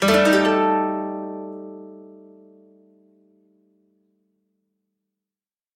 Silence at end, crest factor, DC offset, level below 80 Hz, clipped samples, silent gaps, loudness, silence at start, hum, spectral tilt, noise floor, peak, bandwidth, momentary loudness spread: 3.65 s; 20 dB; under 0.1%; -58 dBFS; under 0.1%; none; -20 LUFS; 0 s; none; -4.5 dB/octave; under -90 dBFS; -4 dBFS; 16.5 kHz; 25 LU